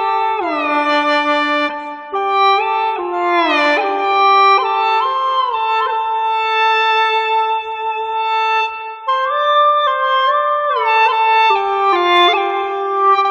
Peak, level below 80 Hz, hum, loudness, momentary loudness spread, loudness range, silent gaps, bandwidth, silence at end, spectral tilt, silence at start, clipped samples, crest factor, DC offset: 0 dBFS; -62 dBFS; none; -14 LUFS; 7 LU; 2 LU; none; 8.8 kHz; 0 s; -2 dB/octave; 0 s; under 0.1%; 14 dB; under 0.1%